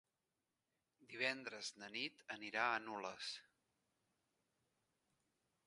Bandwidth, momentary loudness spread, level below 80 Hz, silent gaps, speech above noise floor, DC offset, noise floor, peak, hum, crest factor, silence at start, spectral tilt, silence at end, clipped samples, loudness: 11.5 kHz; 10 LU; under -90 dBFS; none; over 44 dB; under 0.1%; under -90 dBFS; -24 dBFS; none; 26 dB; 1 s; -2 dB/octave; 2.25 s; under 0.1%; -44 LUFS